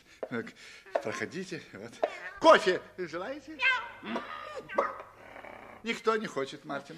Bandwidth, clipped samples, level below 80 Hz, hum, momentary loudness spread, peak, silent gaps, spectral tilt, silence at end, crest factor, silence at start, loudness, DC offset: 13.5 kHz; under 0.1%; -70 dBFS; none; 22 LU; -8 dBFS; none; -4 dB/octave; 0 s; 24 dB; 0.2 s; -31 LUFS; under 0.1%